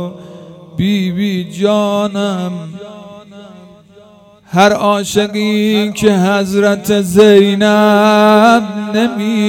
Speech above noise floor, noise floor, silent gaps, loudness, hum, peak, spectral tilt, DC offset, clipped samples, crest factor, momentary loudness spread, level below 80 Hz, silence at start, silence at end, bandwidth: 31 dB; -42 dBFS; none; -11 LUFS; none; 0 dBFS; -5.5 dB/octave; under 0.1%; 0.5%; 12 dB; 14 LU; -50 dBFS; 0 s; 0 s; 16.5 kHz